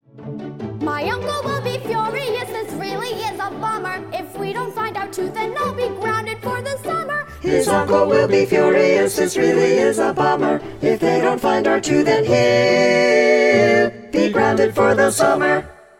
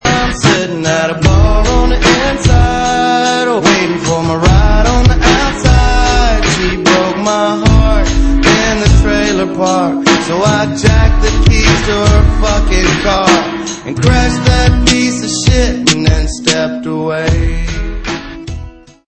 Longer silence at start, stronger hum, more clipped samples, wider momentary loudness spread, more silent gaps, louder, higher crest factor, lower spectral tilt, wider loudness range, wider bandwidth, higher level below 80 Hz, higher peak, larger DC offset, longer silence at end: about the same, 0.15 s vs 0.05 s; neither; second, under 0.1% vs 0.2%; first, 11 LU vs 5 LU; neither; second, -18 LUFS vs -11 LUFS; first, 16 dB vs 10 dB; about the same, -5 dB/octave vs -5 dB/octave; first, 9 LU vs 1 LU; first, 16.5 kHz vs 8.8 kHz; second, -50 dBFS vs -14 dBFS; about the same, -2 dBFS vs 0 dBFS; neither; about the same, 0.25 s vs 0.35 s